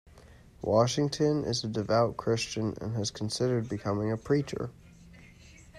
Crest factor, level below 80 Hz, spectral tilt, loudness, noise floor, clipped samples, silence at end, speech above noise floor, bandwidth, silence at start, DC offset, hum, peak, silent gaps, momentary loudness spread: 18 dB; -58 dBFS; -5.5 dB/octave; -30 LUFS; -54 dBFS; under 0.1%; 0 s; 25 dB; 13 kHz; 0.15 s; under 0.1%; none; -12 dBFS; none; 7 LU